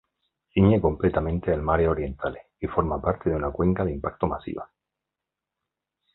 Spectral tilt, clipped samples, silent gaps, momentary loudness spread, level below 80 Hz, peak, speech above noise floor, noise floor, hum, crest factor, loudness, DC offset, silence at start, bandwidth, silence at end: -12.5 dB/octave; under 0.1%; none; 12 LU; -38 dBFS; -4 dBFS; 63 dB; -87 dBFS; none; 22 dB; -25 LUFS; under 0.1%; 0.55 s; 4.1 kHz; 1.5 s